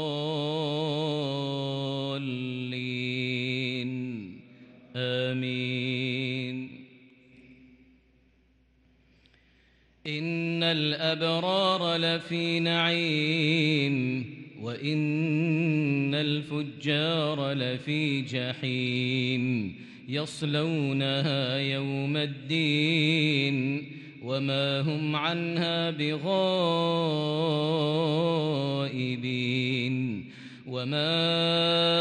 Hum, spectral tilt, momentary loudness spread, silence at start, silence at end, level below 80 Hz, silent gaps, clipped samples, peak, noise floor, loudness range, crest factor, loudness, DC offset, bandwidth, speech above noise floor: none; -6.5 dB/octave; 9 LU; 0 s; 0 s; -72 dBFS; none; under 0.1%; -12 dBFS; -64 dBFS; 6 LU; 16 dB; -28 LUFS; under 0.1%; 10 kHz; 37 dB